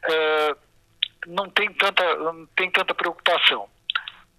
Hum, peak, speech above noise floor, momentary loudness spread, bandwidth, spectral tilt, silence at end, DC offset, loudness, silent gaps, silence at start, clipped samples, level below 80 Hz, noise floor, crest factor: none; -2 dBFS; 24 dB; 10 LU; 14 kHz; -2.5 dB/octave; 0.25 s; under 0.1%; -22 LUFS; none; 0.05 s; under 0.1%; -66 dBFS; -46 dBFS; 22 dB